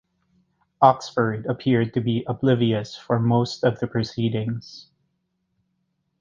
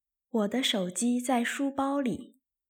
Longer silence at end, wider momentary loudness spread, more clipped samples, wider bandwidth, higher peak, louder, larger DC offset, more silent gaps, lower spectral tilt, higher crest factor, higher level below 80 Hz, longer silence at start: first, 1.4 s vs 0.45 s; about the same, 9 LU vs 7 LU; neither; second, 7.4 kHz vs 17.5 kHz; first, -2 dBFS vs -14 dBFS; first, -22 LUFS vs -29 LUFS; neither; neither; first, -7.5 dB/octave vs -3.5 dB/octave; first, 22 dB vs 16 dB; first, -58 dBFS vs -72 dBFS; first, 0.8 s vs 0.35 s